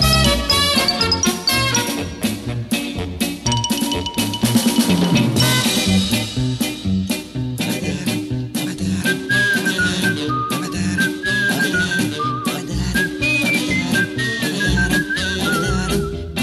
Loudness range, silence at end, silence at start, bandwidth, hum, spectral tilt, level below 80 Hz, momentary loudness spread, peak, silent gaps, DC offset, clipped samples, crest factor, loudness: 3 LU; 0 s; 0 s; 15 kHz; none; -3.5 dB/octave; -34 dBFS; 8 LU; -2 dBFS; none; under 0.1%; under 0.1%; 16 dB; -18 LUFS